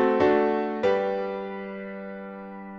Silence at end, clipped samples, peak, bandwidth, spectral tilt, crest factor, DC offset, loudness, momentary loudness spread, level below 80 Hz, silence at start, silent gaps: 0 s; under 0.1%; -8 dBFS; 7.2 kHz; -7 dB/octave; 16 dB; under 0.1%; -26 LUFS; 17 LU; -60 dBFS; 0 s; none